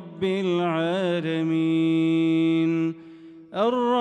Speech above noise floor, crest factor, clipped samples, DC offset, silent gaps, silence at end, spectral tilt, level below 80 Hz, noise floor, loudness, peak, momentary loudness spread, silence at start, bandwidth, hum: 23 dB; 12 dB; under 0.1%; under 0.1%; none; 0 s; -7.5 dB/octave; -70 dBFS; -45 dBFS; -23 LUFS; -10 dBFS; 6 LU; 0 s; 8.6 kHz; none